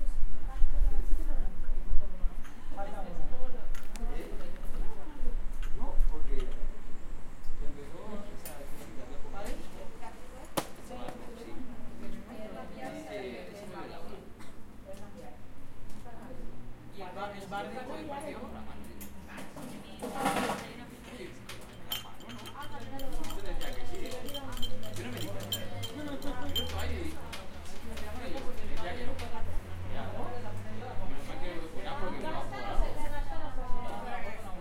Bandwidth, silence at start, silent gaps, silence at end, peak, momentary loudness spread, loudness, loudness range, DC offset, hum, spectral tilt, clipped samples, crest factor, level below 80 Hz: 15 kHz; 0 s; none; 0 s; -8 dBFS; 11 LU; -41 LUFS; 7 LU; under 0.1%; none; -4.5 dB/octave; under 0.1%; 20 dB; -36 dBFS